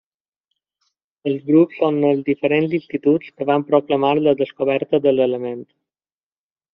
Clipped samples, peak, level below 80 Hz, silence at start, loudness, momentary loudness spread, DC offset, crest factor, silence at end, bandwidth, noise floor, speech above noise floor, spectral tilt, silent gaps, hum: under 0.1%; -2 dBFS; -64 dBFS; 1.25 s; -18 LUFS; 9 LU; under 0.1%; 16 dB; 1.1 s; 5.2 kHz; under -90 dBFS; over 72 dB; -5.5 dB/octave; none; none